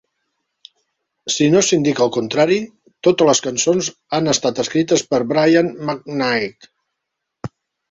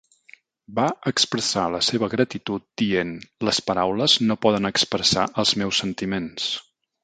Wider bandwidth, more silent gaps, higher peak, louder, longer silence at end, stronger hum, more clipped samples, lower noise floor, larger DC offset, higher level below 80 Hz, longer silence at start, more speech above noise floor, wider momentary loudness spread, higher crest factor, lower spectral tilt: second, 8.2 kHz vs 9.4 kHz; neither; about the same, -2 dBFS vs -4 dBFS; first, -17 LUFS vs -22 LUFS; about the same, 0.45 s vs 0.4 s; neither; neither; first, -78 dBFS vs -53 dBFS; neither; about the same, -58 dBFS vs -54 dBFS; first, 1.25 s vs 0.7 s; first, 62 dB vs 30 dB; first, 14 LU vs 9 LU; about the same, 16 dB vs 20 dB; about the same, -4 dB/octave vs -3.5 dB/octave